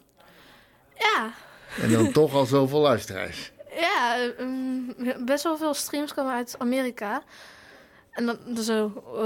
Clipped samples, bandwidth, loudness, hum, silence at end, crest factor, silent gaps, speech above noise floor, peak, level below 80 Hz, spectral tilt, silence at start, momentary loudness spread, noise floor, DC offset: under 0.1%; 17.5 kHz; -25 LUFS; none; 0 s; 18 dB; none; 30 dB; -8 dBFS; -62 dBFS; -5 dB/octave; 1 s; 13 LU; -55 dBFS; under 0.1%